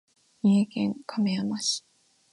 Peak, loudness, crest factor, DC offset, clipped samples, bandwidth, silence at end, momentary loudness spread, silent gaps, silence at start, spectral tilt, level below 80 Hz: -14 dBFS; -27 LUFS; 14 dB; under 0.1%; under 0.1%; 11.5 kHz; 0.55 s; 7 LU; none; 0.45 s; -5 dB/octave; -72 dBFS